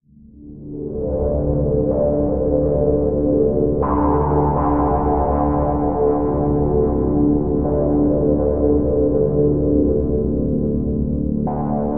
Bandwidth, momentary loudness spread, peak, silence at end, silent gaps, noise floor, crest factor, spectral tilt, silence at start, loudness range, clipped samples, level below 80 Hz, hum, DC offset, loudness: 2.5 kHz; 4 LU; -4 dBFS; 0 s; none; -42 dBFS; 14 dB; -9 dB/octave; 0 s; 1 LU; under 0.1%; -26 dBFS; none; 2%; -18 LUFS